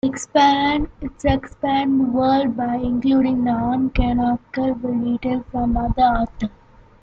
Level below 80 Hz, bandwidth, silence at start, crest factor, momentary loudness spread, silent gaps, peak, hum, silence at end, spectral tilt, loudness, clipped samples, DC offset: -34 dBFS; 8.4 kHz; 0.05 s; 16 dB; 7 LU; none; -2 dBFS; none; 0.55 s; -6 dB/octave; -20 LUFS; under 0.1%; under 0.1%